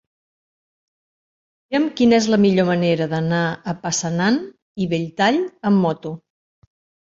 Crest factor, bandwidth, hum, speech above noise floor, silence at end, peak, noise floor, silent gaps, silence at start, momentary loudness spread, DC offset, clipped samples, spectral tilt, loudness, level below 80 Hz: 18 dB; 7.8 kHz; none; over 72 dB; 1 s; -4 dBFS; under -90 dBFS; 4.62-4.75 s; 1.7 s; 11 LU; under 0.1%; under 0.1%; -5.5 dB/octave; -19 LUFS; -58 dBFS